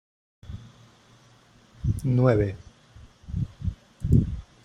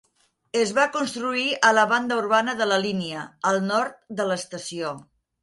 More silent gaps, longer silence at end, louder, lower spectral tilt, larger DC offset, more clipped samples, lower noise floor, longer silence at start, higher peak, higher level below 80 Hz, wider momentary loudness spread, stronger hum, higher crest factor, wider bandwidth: neither; second, 0.2 s vs 0.4 s; second, -26 LUFS vs -23 LUFS; first, -9 dB/octave vs -3.5 dB/octave; neither; neither; second, -56 dBFS vs -67 dBFS; about the same, 0.45 s vs 0.55 s; about the same, -6 dBFS vs -4 dBFS; first, -40 dBFS vs -68 dBFS; first, 22 LU vs 12 LU; neither; about the same, 22 dB vs 20 dB; about the same, 11 kHz vs 11.5 kHz